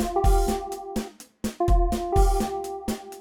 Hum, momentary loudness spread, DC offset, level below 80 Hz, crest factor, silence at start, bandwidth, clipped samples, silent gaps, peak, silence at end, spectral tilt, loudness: none; 11 LU; under 0.1%; -26 dBFS; 16 dB; 0 s; 17 kHz; under 0.1%; none; -8 dBFS; 0 s; -6 dB/octave; -26 LUFS